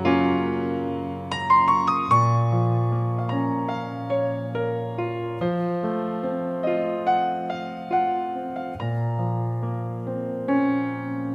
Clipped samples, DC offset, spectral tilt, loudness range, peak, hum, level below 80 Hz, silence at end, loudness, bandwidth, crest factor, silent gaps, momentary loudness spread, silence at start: under 0.1%; under 0.1%; -8 dB/octave; 5 LU; -8 dBFS; none; -62 dBFS; 0 s; -24 LUFS; 8.2 kHz; 16 dB; none; 10 LU; 0 s